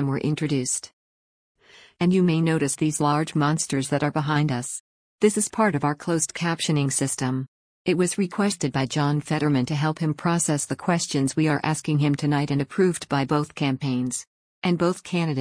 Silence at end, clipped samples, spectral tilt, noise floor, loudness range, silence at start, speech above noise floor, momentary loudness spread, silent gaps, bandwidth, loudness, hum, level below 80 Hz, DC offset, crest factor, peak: 0 s; under 0.1%; -5 dB/octave; under -90 dBFS; 1 LU; 0 s; over 67 dB; 4 LU; 0.93-1.55 s, 4.80-5.19 s, 7.48-7.85 s, 14.27-14.62 s; 10.5 kHz; -24 LUFS; none; -60 dBFS; under 0.1%; 16 dB; -6 dBFS